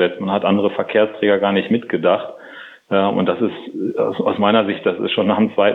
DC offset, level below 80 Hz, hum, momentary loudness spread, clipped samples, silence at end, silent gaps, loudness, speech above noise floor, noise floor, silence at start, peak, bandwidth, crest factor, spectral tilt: under 0.1%; -68 dBFS; none; 8 LU; under 0.1%; 0 s; none; -18 LUFS; 21 dB; -39 dBFS; 0 s; -2 dBFS; 4.2 kHz; 16 dB; -8.5 dB/octave